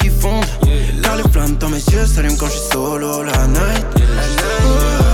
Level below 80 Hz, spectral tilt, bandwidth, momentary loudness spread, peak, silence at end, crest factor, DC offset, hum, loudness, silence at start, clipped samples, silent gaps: -16 dBFS; -5 dB/octave; 17.5 kHz; 3 LU; -4 dBFS; 0 s; 8 dB; under 0.1%; none; -16 LUFS; 0 s; under 0.1%; none